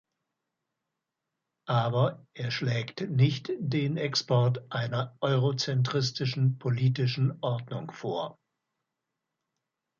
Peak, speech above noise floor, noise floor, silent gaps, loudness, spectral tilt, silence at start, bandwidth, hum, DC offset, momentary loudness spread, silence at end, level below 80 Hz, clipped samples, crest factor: -12 dBFS; 58 dB; -86 dBFS; none; -29 LUFS; -6 dB/octave; 1.65 s; 7.2 kHz; none; under 0.1%; 9 LU; 1.65 s; -68 dBFS; under 0.1%; 18 dB